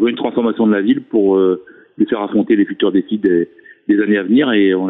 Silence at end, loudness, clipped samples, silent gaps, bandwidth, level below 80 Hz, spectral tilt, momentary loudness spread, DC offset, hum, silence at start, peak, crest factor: 0 s; -15 LUFS; under 0.1%; none; 4 kHz; -60 dBFS; -10 dB/octave; 5 LU; under 0.1%; none; 0 s; -4 dBFS; 12 dB